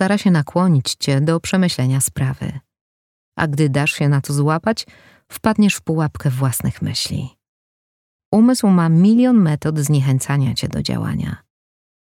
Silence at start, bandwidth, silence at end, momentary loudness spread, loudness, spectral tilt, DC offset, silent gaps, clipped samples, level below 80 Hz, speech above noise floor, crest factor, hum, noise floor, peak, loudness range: 0 s; 17 kHz; 0.75 s; 12 LU; -17 LUFS; -6 dB/octave; under 0.1%; 2.81-3.32 s, 7.49-8.19 s, 8.25-8.32 s; under 0.1%; -46 dBFS; over 74 dB; 16 dB; none; under -90 dBFS; -2 dBFS; 5 LU